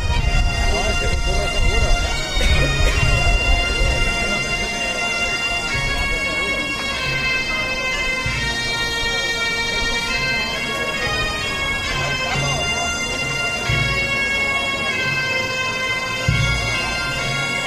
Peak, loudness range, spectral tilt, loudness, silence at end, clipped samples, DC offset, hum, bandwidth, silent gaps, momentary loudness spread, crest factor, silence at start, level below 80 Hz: -4 dBFS; 1 LU; -3 dB/octave; -19 LUFS; 0 s; under 0.1%; under 0.1%; none; 15.5 kHz; none; 3 LU; 16 dB; 0 s; -24 dBFS